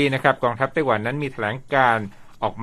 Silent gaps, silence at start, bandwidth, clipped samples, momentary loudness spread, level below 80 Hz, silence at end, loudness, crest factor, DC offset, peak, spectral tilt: none; 0 s; 13.5 kHz; under 0.1%; 10 LU; -54 dBFS; 0 s; -22 LUFS; 20 dB; under 0.1%; 0 dBFS; -6.5 dB/octave